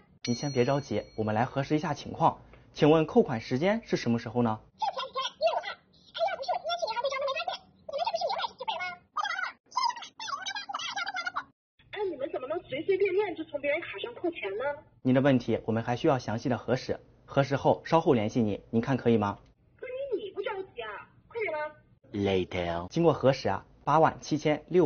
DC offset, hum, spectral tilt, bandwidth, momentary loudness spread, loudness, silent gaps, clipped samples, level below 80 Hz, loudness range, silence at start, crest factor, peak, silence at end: under 0.1%; none; -5 dB/octave; 6.8 kHz; 13 LU; -30 LUFS; 9.60-9.64 s, 11.53-11.78 s; under 0.1%; -60 dBFS; 6 LU; 0.25 s; 22 dB; -8 dBFS; 0 s